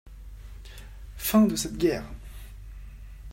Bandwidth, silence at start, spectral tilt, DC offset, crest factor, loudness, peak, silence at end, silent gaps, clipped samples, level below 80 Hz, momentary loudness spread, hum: 16.5 kHz; 0.05 s; -5 dB/octave; under 0.1%; 20 dB; -25 LUFS; -10 dBFS; 0 s; none; under 0.1%; -42 dBFS; 25 LU; none